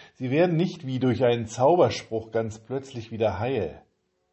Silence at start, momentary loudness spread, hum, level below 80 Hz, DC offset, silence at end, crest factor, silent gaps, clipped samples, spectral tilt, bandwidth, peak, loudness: 0 s; 12 LU; none; -54 dBFS; under 0.1%; 0.55 s; 18 dB; none; under 0.1%; -6.5 dB/octave; 8.6 kHz; -6 dBFS; -25 LUFS